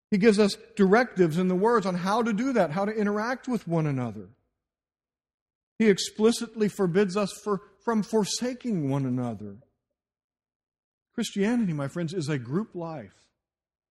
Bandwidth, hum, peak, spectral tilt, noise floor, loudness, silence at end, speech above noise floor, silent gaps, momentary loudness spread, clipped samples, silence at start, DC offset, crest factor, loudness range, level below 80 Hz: 13 kHz; none; -8 dBFS; -6 dB/octave; under -90 dBFS; -26 LUFS; 0.85 s; over 64 dB; 5.34-5.46 s, 5.55-5.76 s, 10.24-10.30 s, 10.56-10.60 s, 10.84-10.98 s; 11 LU; under 0.1%; 0.1 s; under 0.1%; 20 dB; 7 LU; -64 dBFS